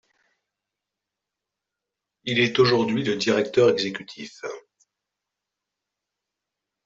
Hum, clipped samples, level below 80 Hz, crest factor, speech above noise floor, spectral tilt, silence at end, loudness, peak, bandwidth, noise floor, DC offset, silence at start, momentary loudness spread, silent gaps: 50 Hz at -65 dBFS; under 0.1%; -66 dBFS; 20 dB; 64 dB; -5 dB/octave; 2.25 s; -21 LUFS; -6 dBFS; 7.8 kHz; -86 dBFS; under 0.1%; 2.25 s; 18 LU; none